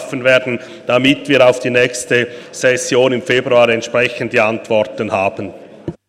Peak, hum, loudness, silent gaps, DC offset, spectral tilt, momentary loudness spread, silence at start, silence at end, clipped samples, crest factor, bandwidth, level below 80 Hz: 0 dBFS; none; -14 LUFS; none; under 0.1%; -4 dB/octave; 12 LU; 0 s; 0.15 s; under 0.1%; 14 dB; 14 kHz; -54 dBFS